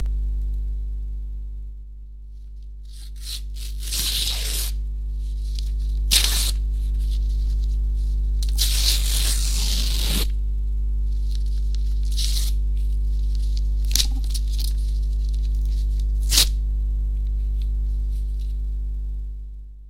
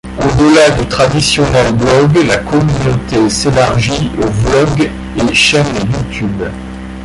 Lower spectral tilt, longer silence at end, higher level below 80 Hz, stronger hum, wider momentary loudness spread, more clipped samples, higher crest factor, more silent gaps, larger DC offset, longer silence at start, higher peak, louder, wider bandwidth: second, -2.5 dB/octave vs -5 dB/octave; about the same, 0 s vs 0 s; about the same, -22 dBFS vs -26 dBFS; first, 50 Hz at -20 dBFS vs none; first, 15 LU vs 9 LU; neither; first, 22 dB vs 10 dB; neither; first, 0.2% vs under 0.1%; about the same, 0 s vs 0.05 s; about the same, 0 dBFS vs 0 dBFS; second, -24 LUFS vs -11 LUFS; first, 16.5 kHz vs 11.5 kHz